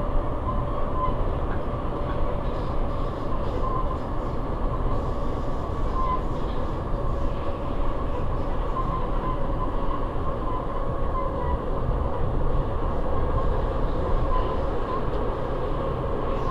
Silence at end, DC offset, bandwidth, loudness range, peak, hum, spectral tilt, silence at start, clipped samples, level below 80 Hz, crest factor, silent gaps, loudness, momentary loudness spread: 0 s; 0.4%; 5.2 kHz; 2 LU; -10 dBFS; none; -8.5 dB/octave; 0 s; under 0.1%; -28 dBFS; 14 dB; none; -29 LUFS; 3 LU